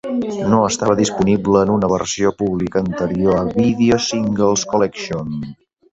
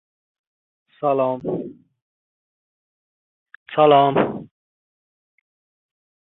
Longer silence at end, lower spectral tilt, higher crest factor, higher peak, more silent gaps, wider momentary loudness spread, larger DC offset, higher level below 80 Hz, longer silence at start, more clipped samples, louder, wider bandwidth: second, 0.4 s vs 1.75 s; second, -5.5 dB/octave vs -10.5 dB/octave; second, 16 dB vs 22 dB; about the same, -2 dBFS vs -2 dBFS; second, none vs 2.02-3.46 s, 3.56-3.66 s; second, 9 LU vs 16 LU; neither; first, -44 dBFS vs -66 dBFS; second, 0.05 s vs 1 s; neither; about the same, -17 LUFS vs -19 LUFS; first, 8.2 kHz vs 4.1 kHz